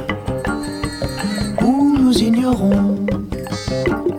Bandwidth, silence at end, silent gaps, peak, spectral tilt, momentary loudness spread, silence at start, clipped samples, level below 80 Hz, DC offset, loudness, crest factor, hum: 16.5 kHz; 0 s; none; -4 dBFS; -6 dB/octave; 10 LU; 0 s; under 0.1%; -34 dBFS; under 0.1%; -18 LUFS; 14 dB; none